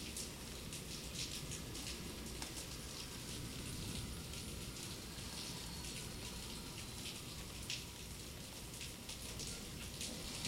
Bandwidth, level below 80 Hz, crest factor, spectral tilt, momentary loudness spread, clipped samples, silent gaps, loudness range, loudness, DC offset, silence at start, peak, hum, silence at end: 16 kHz; -56 dBFS; 24 dB; -3 dB/octave; 3 LU; under 0.1%; none; 1 LU; -46 LUFS; under 0.1%; 0 s; -24 dBFS; none; 0 s